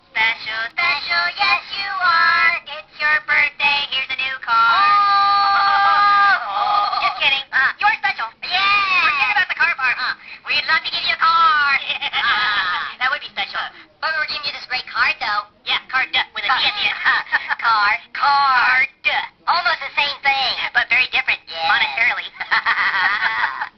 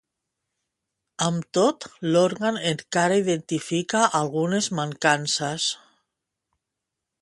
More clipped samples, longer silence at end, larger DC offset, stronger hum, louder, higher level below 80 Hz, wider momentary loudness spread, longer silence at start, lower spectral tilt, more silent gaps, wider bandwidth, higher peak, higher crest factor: neither; second, 0.1 s vs 1.45 s; neither; neither; first, -17 LUFS vs -23 LUFS; first, -56 dBFS vs -68 dBFS; about the same, 8 LU vs 6 LU; second, 0.15 s vs 1.2 s; second, 4 dB/octave vs -4 dB/octave; neither; second, 6.4 kHz vs 11.5 kHz; about the same, -4 dBFS vs -4 dBFS; second, 14 dB vs 22 dB